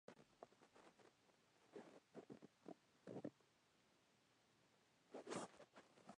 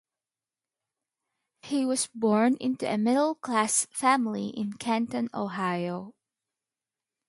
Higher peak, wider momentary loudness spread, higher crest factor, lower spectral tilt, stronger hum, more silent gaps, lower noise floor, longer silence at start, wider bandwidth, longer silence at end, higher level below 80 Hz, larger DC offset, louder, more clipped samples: second, -36 dBFS vs -10 dBFS; first, 14 LU vs 8 LU; first, 26 dB vs 20 dB; about the same, -4.5 dB/octave vs -4 dB/octave; neither; neither; second, -79 dBFS vs under -90 dBFS; second, 0.1 s vs 1.65 s; second, 10 kHz vs 11.5 kHz; second, 0 s vs 1.15 s; second, under -90 dBFS vs -76 dBFS; neither; second, -60 LUFS vs -27 LUFS; neither